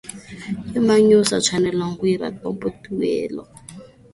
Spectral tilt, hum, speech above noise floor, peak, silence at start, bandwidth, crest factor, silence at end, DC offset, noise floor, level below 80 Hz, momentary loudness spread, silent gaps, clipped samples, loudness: -4.5 dB/octave; none; 23 dB; -2 dBFS; 0.05 s; 11.5 kHz; 18 dB; 0.3 s; under 0.1%; -42 dBFS; -52 dBFS; 21 LU; none; under 0.1%; -20 LUFS